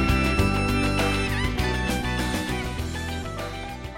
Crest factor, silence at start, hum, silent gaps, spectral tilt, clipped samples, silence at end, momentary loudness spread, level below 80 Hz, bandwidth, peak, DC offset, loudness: 14 dB; 0 s; none; none; -5 dB/octave; under 0.1%; 0 s; 10 LU; -32 dBFS; 16.5 kHz; -10 dBFS; under 0.1%; -25 LUFS